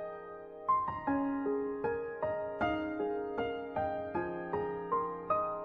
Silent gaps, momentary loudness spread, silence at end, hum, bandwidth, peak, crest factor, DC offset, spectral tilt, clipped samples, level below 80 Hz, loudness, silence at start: none; 5 LU; 0 s; none; 5.4 kHz; -20 dBFS; 16 dB; under 0.1%; -8.5 dB/octave; under 0.1%; -62 dBFS; -35 LUFS; 0 s